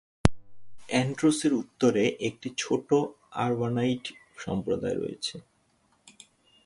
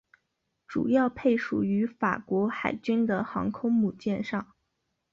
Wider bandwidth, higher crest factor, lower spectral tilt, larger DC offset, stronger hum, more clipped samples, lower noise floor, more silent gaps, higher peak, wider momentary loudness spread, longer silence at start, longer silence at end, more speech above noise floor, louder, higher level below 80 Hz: first, 11.5 kHz vs 7.2 kHz; first, 28 dB vs 16 dB; second, -5.5 dB/octave vs -8 dB/octave; neither; neither; neither; second, -68 dBFS vs -79 dBFS; neither; first, 0 dBFS vs -12 dBFS; first, 11 LU vs 6 LU; second, 0.25 s vs 0.7 s; second, 0.55 s vs 0.7 s; second, 41 dB vs 52 dB; about the same, -28 LUFS vs -28 LUFS; first, -46 dBFS vs -62 dBFS